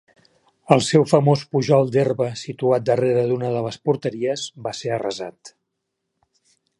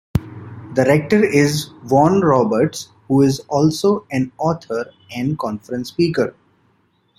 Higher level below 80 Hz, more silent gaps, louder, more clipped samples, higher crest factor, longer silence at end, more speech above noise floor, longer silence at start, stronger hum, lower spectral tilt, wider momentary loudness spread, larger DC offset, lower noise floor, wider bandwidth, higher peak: second, -64 dBFS vs -46 dBFS; neither; about the same, -20 LUFS vs -18 LUFS; neither; about the same, 20 dB vs 16 dB; first, 1.3 s vs 0.9 s; first, 58 dB vs 44 dB; first, 0.7 s vs 0.15 s; neither; about the same, -6 dB/octave vs -6.5 dB/octave; about the same, 11 LU vs 12 LU; neither; first, -78 dBFS vs -61 dBFS; second, 11.5 kHz vs 15.5 kHz; about the same, 0 dBFS vs -2 dBFS